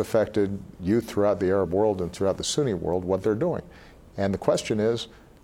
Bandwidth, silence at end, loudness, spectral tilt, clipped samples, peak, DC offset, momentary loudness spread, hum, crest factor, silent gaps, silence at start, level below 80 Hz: 16.5 kHz; 0.25 s; -25 LUFS; -5.5 dB/octave; under 0.1%; -6 dBFS; under 0.1%; 7 LU; none; 18 dB; none; 0 s; -54 dBFS